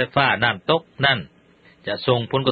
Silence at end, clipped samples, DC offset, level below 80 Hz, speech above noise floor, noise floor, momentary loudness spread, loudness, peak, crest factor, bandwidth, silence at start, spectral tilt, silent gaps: 0 s; under 0.1%; under 0.1%; -54 dBFS; 33 dB; -53 dBFS; 8 LU; -20 LUFS; -2 dBFS; 20 dB; 5 kHz; 0 s; -8.5 dB/octave; none